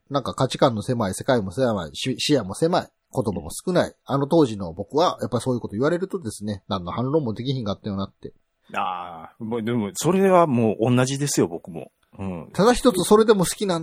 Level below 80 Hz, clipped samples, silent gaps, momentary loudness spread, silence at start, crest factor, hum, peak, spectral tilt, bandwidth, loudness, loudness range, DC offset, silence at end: -50 dBFS; under 0.1%; none; 14 LU; 0.1 s; 20 dB; none; -2 dBFS; -5.5 dB/octave; 16.5 kHz; -22 LUFS; 7 LU; under 0.1%; 0 s